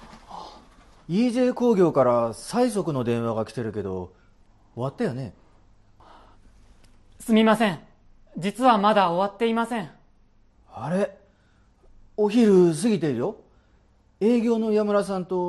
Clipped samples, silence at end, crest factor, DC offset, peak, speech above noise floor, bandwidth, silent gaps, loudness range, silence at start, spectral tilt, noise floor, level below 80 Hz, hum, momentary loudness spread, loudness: under 0.1%; 0 s; 18 dB; under 0.1%; -6 dBFS; 37 dB; 12.5 kHz; none; 8 LU; 0 s; -6.5 dB/octave; -59 dBFS; -56 dBFS; none; 20 LU; -23 LUFS